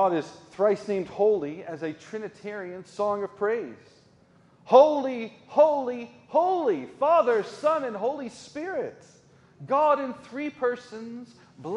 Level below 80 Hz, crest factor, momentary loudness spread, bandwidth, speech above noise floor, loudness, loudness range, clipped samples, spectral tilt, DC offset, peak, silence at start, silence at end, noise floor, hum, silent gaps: -74 dBFS; 22 dB; 17 LU; 10.5 kHz; 33 dB; -26 LUFS; 6 LU; under 0.1%; -6 dB/octave; under 0.1%; -4 dBFS; 0 s; 0 s; -58 dBFS; none; none